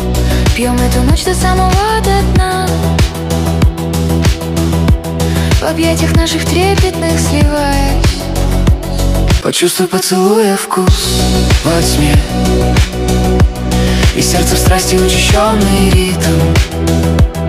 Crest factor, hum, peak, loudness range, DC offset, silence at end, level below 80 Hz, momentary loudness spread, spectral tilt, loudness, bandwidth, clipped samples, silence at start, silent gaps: 10 dB; none; 0 dBFS; 2 LU; under 0.1%; 0 s; -16 dBFS; 4 LU; -5 dB/octave; -11 LUFS; 16 kHz; under 0.1%; 0 s; none